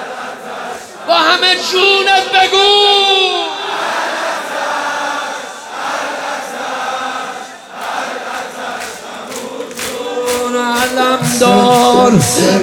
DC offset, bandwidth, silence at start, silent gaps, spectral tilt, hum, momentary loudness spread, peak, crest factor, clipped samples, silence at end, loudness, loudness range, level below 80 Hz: under 0.1%; over 20 kHz; 0 s; none; -3 dB/octave; none; 16 LU; 0 dBFS; 14 dB; under 0.1%; 0 s; -12 LUFS; 12 LU; -52 dBFS